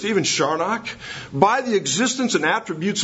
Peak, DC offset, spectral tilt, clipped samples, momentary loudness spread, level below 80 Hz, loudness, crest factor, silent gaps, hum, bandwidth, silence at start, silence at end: 0 dBFS; under 0.1%; -3 dB/octave; under 0.1%; 10 LU; -60 dBFS; -20 LUFS; 20 dB; none; none; 8 kHz; 0 s; 0 s